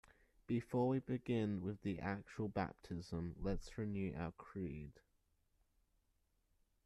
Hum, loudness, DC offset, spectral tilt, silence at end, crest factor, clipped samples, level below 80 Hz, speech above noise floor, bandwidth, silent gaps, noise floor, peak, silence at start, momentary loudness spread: none; -43 LUFS; under 0.1%; -8 dB/octave; 1.95 s; 16 dB; under 0.1%; -60 dBFS; 39 dB; 12.5 kHz; none; -81 dBFS; -28 dBFS; 0.5 s; 10 LU